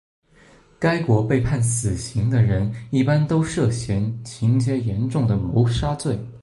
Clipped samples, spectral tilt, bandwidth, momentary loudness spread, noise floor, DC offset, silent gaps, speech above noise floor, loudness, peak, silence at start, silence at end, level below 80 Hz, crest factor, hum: under 0.1%; -6.5 dB/octave; 11.5 kHz; 5 LU; -52 dBFS; under 0.1%; none; 32 dB; -21 LUFS; -4 dBFS; 0.8 s; 0.05 s; -40 dBFS; 16 dB; none